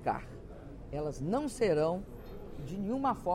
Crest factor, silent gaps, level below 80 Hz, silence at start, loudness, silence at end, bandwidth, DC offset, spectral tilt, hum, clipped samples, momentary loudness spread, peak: 16 dB; none; -50 dBFS; 0 s; -34 LUFS; 0 s; 15.5 kHz; under 0.1%; -6.5 dB/octave; none; under 0.1%; 18 LU; -18 dBFS